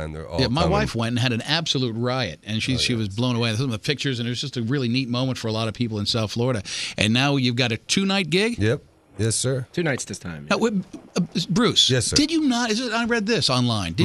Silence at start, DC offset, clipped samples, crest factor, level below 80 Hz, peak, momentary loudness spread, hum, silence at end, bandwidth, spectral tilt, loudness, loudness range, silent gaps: 0 s; under 0.1%; under 0.1%; 20 dB; -46 dBFS; -2 dBFS; 7 LU; none; 0 s; 13 kHz; -4.5 dB/octave; -22 LUFS; 4 LU; none